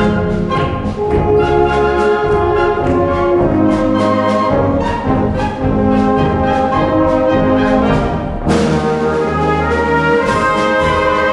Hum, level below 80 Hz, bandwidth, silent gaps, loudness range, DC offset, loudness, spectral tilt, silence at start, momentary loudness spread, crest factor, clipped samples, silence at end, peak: none; -28 dBFS; 11.5 kHz; none; 1 LU; under 0.1%; -13 LUFS; -7 dB/octave; 0 s; 4 LU; 12 dB; under 0.1%; 0 s; 0 dBFS